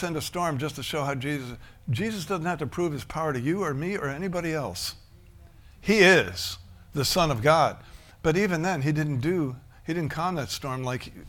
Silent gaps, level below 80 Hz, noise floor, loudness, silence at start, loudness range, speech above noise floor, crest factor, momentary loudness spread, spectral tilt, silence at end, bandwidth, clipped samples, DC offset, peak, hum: none; -50 dBFS; -51 dBFS; -26 LUFS; 0 s; 7 LU; 24 dB; 22 dB; 12 LU; -5 dB/octave; 0 s; 18 kHz; under 0.1%; under 0.1%; -6 dBFS; none